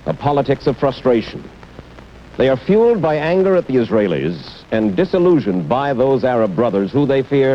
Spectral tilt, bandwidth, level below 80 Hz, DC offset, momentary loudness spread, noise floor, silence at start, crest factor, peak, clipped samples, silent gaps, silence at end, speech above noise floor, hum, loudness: -8.5 dB/octave; 7.6 kHz; -44 dBFS; under 0.1%; 6 LU; -39 dBFS; 0.05 s; 14 dB; -2 dBFS; under 0.1%; none; 0 s; 23 dB; none; -16 LUFS